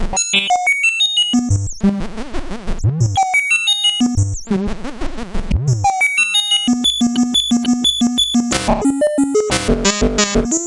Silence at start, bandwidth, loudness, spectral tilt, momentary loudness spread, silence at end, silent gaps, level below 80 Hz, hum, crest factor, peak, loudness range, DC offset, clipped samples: 0 s; 11.5 kHz; -15 LUFS; -3.5 dB/octave; 12 LU; 0 s; none; -28 dBFS; none; 14 dB; -2 dBFS; 2 LU; under 0.1%; under 0.1%